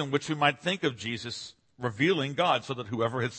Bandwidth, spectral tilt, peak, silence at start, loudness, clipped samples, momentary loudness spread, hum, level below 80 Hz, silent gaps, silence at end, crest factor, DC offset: 8.8 kHz; -5 dB/octave; -8 dBFS; 0 s; -29 LUFS; under 0.1%; 10 LU; none; -68 dBFS; none; 0 s; 22 dB; under 0.1%